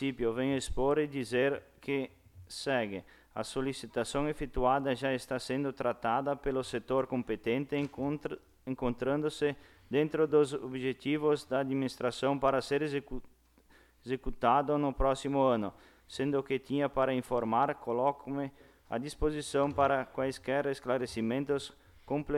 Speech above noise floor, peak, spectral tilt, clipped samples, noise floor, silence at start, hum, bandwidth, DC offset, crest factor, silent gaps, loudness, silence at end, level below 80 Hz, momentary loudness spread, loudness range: 31 dB; -14 dBFS; -6 dB/octave; under 0.1%; -63 dBFS; 0 s; none; 14.5 kHz; under 0.1%; 18 dB; none; -33 LUFS; 0 s; -50 dBFS; 10 LU; 3 LU